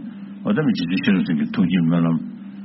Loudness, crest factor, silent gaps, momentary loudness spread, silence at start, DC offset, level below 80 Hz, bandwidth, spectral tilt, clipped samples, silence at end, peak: -20 LUFS; 14 dB; none; 10 LU; 0 s; under 0.1%; -58 dBFS; 5.8 kHz; -6.5 dB/octave; under 0.1%; 0 s; -6 dBFS